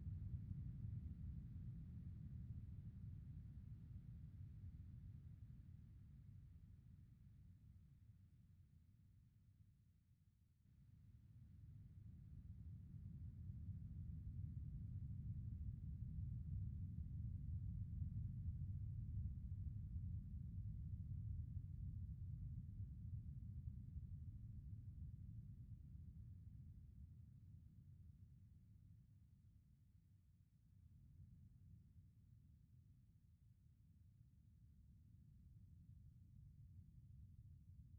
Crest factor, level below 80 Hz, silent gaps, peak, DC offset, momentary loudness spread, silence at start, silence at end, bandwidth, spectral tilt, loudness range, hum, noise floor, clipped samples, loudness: 18 dB; -60 dBFS; none; -38 dBFS; under 0.1%; 16 LU; 0 s; 0 s; 2.4 kHz; -14.5 dB/octave; 18 LU; none; -76 dBFS; under 0.1%; -55 LUFS